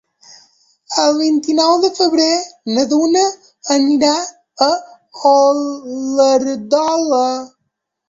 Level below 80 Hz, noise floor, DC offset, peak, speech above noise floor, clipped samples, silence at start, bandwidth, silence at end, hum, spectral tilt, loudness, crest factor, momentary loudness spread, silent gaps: -62 dBFS; -73 dBFS; under 0.1%; 0 dBFS; 59 dB; under 0.1%; 0.9 s; 7.8 kHz; 0.6 s; none; -2.5 dB/octave; -15 LUFS; 14 dB; 8 LU; none